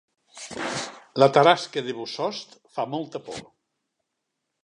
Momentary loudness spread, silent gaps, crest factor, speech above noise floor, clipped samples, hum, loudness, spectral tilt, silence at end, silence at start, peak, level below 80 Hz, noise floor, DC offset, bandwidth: 20 LU; none; 24 dB; 58 dB; under 0.1%; none; -24 LUFS; -4.5 dB/octave; 1.2 s; 0.35 s; -2 dBFS; -70 dBFS; -81 dBFS; under 0.1%; 11 kHz